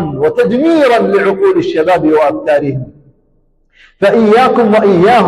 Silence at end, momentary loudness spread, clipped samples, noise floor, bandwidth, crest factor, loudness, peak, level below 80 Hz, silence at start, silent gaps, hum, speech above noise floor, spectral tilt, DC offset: 0 s; 6 LU; under 0.1%; -53 dBFS; 12.5 kHz; 8 dB; -10 LUFS; -2 dBFS; -46 dBFS; 0 s; none; none; 44 dB; -7 dB/octave; under 0.1%